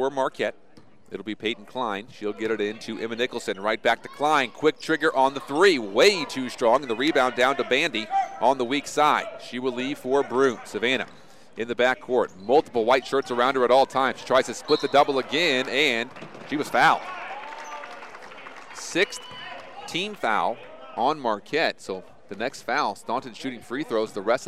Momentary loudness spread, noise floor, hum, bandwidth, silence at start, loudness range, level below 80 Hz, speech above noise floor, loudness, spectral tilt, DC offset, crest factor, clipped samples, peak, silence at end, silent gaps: 17 LU; -55 dBFS; none; 15 kHz; 0 s; 7 LU; -64 dBFS; 31 dB; -24 LUFS; -3.5 dB/octave; 0.4%; 18 dB; under 0.1%; -6 dBFS; 0 s; none